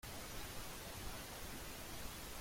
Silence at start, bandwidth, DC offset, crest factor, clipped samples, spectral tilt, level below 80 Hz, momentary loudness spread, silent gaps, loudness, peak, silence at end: 0.05 s; 16.5 kHz; under 0.1%; 14 dB; under 0.1%; -3 dB/octave; -56 dBFS; 1 LU; none; -49 LUFS; -34 dBFS; 0 s